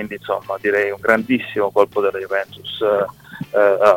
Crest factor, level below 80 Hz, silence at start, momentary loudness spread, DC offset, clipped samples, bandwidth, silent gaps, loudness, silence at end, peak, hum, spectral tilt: 18 dB; -58 dBFS; 0 s; 8 LU; under 0.1%; under 0.1%; 17 kHz; none; -19 LUFS; 0 s; 0 dBFS; none; -5.5 dB/octave